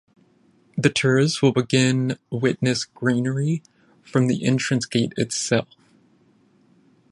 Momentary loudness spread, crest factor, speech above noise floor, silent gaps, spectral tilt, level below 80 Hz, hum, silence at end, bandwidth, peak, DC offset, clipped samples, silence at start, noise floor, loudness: 6 LU; 20 dB; 38 dB; none; -5 dB/octave; -62 dBFS; none; 1.5 s; 11.5 kHz; -2 dBFS; under 0.1%; under 0.1%; 0.75 s; -59 dBFS; -22 LUFS